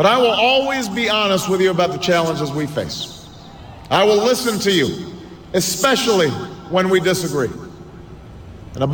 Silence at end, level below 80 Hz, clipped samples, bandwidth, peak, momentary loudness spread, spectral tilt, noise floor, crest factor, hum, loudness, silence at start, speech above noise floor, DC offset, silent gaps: 0 s; -48 dBFS; under 0.1%; 18 kHz; -2 dBFS; 22 LU; -4 dB/octave; -38 dBFS; 16 dB; none; -17 LUFS; 0 s; 21 dB; under 0.1%; none